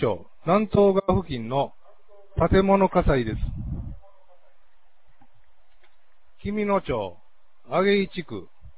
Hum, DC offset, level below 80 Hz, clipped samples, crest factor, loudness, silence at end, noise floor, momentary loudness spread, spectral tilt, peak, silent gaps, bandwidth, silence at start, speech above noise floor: none; 0.8%; -38 dBFS; under 0.1%; 18 dB; -24 LUFS; 0.1 s; -64 dBFS; 16 LU; -11 dB/octave; -6 dBFS; none; 4 kHz; 0 s; 42 dB